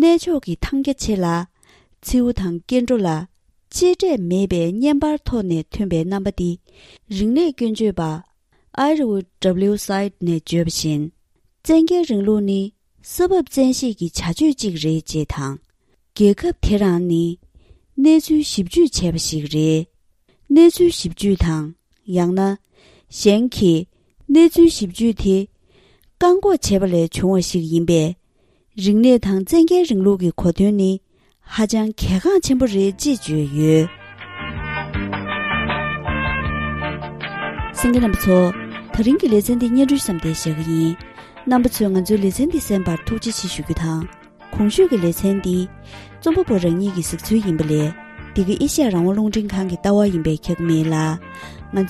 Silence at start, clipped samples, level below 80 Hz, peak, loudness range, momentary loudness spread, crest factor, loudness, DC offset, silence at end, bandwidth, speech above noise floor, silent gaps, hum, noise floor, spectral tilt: 0 s; under 0.1%; -36 dBFS; -2 dBFS; 4 LU; 12 LU; 16 dB; -18 LUFS; under 0.1%; 0 s; 14.5 kHz; 45 dB; none; none; -62 dBFS; -6 dB/octave